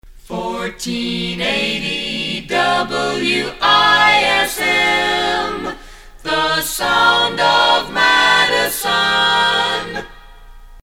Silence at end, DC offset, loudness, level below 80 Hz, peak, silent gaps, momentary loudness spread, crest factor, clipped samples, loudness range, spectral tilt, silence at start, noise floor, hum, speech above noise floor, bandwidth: 0.05 s; under 0.1%; -14 LUFS; -42 dBFS; 0 dBFS; none; 13 LU; 16 dB; under 0.1%; 4 LU; -2 dB/octave; 0.1 s; -38 dBFS; none; 22 dB; 16.5 kHz